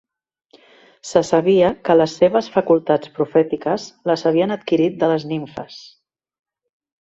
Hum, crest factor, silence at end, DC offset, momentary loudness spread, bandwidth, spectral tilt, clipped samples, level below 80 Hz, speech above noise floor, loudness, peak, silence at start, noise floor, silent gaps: none; 18 dB; 1.2 s; under 0.1%; 11 LU; 8 kHz; -6 dB/octave; under 0.1%; -58 dBFS; 32 dB; -18 LUFS; -2 dBFS; 1.05 s; -50 dBFS; none